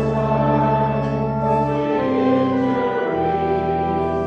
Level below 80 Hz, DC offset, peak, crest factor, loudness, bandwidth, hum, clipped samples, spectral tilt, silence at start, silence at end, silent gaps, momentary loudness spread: -40 dBFS; under 0.1%; -6 dBFS; 12 dB; -19 LUFS; 6.8 kHz; none; under 0.1%; -9 dB/octave; 0 s; 0 s; none; 3 LU